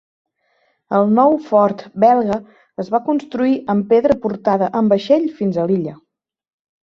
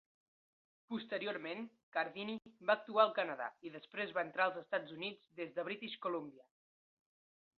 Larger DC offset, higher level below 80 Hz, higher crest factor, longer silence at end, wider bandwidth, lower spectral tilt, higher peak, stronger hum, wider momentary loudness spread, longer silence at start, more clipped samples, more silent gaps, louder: neither; first, -56 dBFS vs -90 dBFS; second, 16 dB vs 26 dB; second, 0.9 s vs 1.15 s; first, 7 kHz vs 4.9 kHz; first, -8.5 dB/octave vs -1.5 dB/octave; first, -2 dBFS vs -16 dBFS; neither; second, 8 LU vs 13 LU; about the same, 0.9 s vs 0.9 s; neither; second, none vs 1.83-1.92 s; first, -16 LUFS vs -40 LUFS